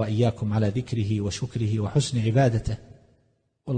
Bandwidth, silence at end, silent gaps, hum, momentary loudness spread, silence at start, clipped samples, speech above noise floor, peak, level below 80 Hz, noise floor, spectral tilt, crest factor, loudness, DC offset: 9.6 kHz; 0 s; none; none; 8 LU; 0 s; under 0.1%; 44 dB; -8 dBFS; -46 dBFS; -68 dBFS; -6.5 dB/octave; 16 dB; -25 LUFS; under 0.1%